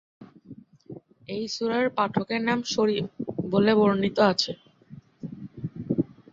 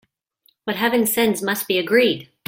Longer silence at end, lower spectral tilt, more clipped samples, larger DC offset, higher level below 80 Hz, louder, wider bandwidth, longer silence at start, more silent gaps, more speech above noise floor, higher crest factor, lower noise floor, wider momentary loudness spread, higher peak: about the same, 0.25 s vs 0.25 s; first, -5.5 dB/octave vs -3.5 dB/octave; neither; neither; about the same, -62 dBFS vs -64 dBFS; second, -25 LUFS vs -19 LUFS; second, 7.6 kHz vs 17 kHz; second, 0.2 s vs 0.65 s; neither; second, 25 dB vs 44 dB; about the same, 18 dB vs 18 dB; second, -49 dBFS vs -63 dBFS; first, 20 LU vs 7 LU; second, -8 dBFS vs -4 dBFS